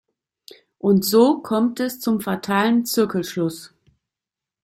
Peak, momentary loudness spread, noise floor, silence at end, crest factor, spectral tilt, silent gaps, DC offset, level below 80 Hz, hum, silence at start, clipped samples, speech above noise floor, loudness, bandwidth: -4 dBFS; 9 LU; -88 dBFS; 0.95 s; 18 dB; -5 dB/octave; none; under 0.1%; -62 dBFS; none; 0.85 s; under 0.1%; 68 dB; -20 LUFS; 16 kHz